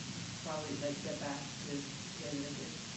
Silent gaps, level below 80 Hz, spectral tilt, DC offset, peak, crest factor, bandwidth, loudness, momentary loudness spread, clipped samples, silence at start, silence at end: none; -68 dBFS; -4 dB/octave; under 0.1%; -26 dBFS; 16 dB; 8.4 kHz; -41 LUFS; 4 LU; under 0.1%; 0 s; 0 s